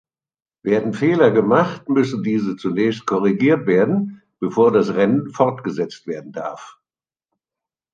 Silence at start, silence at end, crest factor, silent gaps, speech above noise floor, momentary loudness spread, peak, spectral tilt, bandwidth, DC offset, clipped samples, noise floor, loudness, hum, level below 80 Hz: 0.65 s; 1.25 s; 16 dB; none; over 72 dB; 14 LU; -2 dBFS; -7.5 dB/octave; 7.6 kHz; under 0.1%; under 0.1%; under -90 dBFS; -18 LUFS; none; -64 dBFS